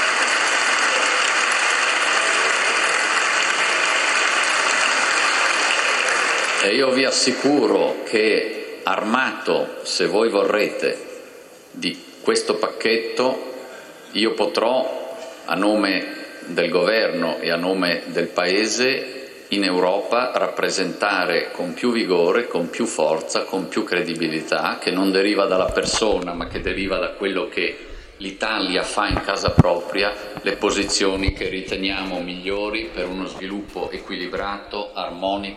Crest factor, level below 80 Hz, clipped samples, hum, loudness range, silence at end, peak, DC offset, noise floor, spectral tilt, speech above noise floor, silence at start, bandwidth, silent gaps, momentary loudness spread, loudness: 20 dB; -44 dBFS; under 0.1%; none; 6 LU; 0 s; 0 dBFS; under 0.1%; -43 dBFS; -3 dB/octave; 22 dB; 0 s; 13.5 kHz; none; 11 LU; -20 LUFS